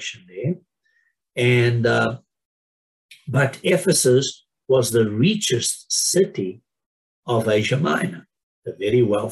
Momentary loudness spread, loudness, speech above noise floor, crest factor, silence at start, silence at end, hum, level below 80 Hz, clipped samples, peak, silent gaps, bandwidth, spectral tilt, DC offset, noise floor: 15 LU; -20 LUFS; 47 dB; 16 dB; 0 s; 0 s; none; -62 dBFS; under 0.1%; -6 dBFS; 2.45-3.09 s, 6.86-7.23 s, 8.43-8.62 s; 13 kHz; -4.5 dB/octave; under 0.1%; -67 dBFS